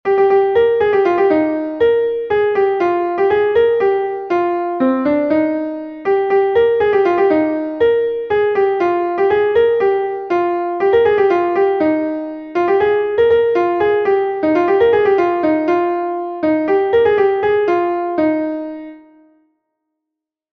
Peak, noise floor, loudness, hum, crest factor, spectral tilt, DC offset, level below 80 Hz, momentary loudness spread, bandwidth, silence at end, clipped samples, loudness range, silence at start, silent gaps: -2 dBFS; -81 dBFS; -15 LUFS; none; 12 dB; -7.5 dB/octave; under 0.1%; -52 dBFS; 6 LU; 6.2 kHz; 1.55 s; under 0.1%; 2 LU; 0.05 s; none